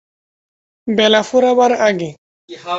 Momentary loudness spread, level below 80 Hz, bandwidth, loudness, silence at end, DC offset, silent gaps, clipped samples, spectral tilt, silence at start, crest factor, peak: 17 LU; -62 dBFS; 8 kHz; -14 LUFS; 0 s; under 0.1%; 2.18-2.48 s; under 0.1%; -4 dB/octave; 0.85 s; 14 dB; -2 dBFS